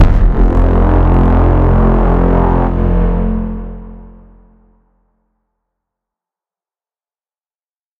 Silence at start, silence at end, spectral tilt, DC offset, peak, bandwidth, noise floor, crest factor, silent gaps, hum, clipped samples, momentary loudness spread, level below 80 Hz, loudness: 0 s; 3.95 s; -10.5 dB/octave; under 0.1%; 0 dBFS; 3.5 kHz; under -90 dBFS; 12 dB; none; none; under 0.1%; 10 LU; -14 dBFS; -12 LUFS